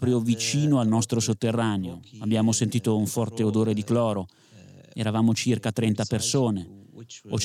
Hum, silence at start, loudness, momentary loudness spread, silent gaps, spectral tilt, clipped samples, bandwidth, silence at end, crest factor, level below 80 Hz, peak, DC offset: none; 0 s; -25 LUFS; 11 LU; none; -5.5 dB/octave; under 0.1%; 15 kHz; 0 s; 14 dB; -62 dBFS; -12 dBFS; under 0.1%